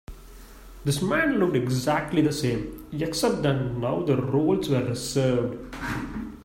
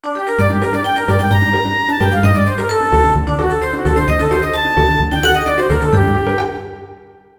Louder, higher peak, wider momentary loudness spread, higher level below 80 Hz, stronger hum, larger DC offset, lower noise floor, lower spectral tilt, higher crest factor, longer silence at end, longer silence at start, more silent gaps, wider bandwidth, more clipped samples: second, -25 LUFS vs -15 LUFS; second, -10 dBFS vs 0 dBFS; first, 9 LU vs 4 LU; second, -46 dBFS vs -26 dBFS; neither; neither; first, -45 dBFS vs -40 dBFS; about the same, -6 dB/octave vs -6 dB/octave; about the same, 16 dB vs 14 dB; second, 0 s vs 0.45 s; about the same, 0.1 s vs 0.05 s; neither; second, 16 kHz vs 20 kHz; neither